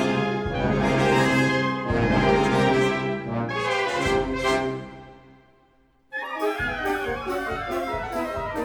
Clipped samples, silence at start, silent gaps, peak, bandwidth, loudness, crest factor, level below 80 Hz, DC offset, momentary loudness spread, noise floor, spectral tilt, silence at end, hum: under 0.1%; 0 s; none; -6 dBFS; over 20 kHz; -24 LUFS; 18 dB; -42 dBFS; under 0.1%; 9 LU; -60 dBFS; -5.5 dB/octave; 0 s; none